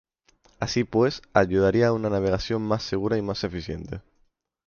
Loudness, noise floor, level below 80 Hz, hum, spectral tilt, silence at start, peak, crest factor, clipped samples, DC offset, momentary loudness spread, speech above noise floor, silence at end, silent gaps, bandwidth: -24 LUFS; -67 dBFS; -46 dBFS; none; -6.5 dB/octave; 0.6 s; -4 dBFS; 20 dB; under 0.1%; under 0.1%; 13 LU; 43 dB; 0.65 s; none; 7 kHz